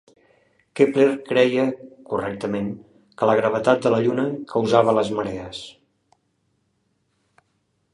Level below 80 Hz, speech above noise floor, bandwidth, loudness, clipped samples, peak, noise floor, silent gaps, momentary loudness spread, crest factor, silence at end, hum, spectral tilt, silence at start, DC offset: -60 dBFS; 49 dB; 11 kHz; -21 LUFS; under 0.1%; -2 dBFS; -70 dBFS; none; 17 LU; 20 dB; 2.25 s; none; -6.5 dB/octave; 0.75 s; under 0.1%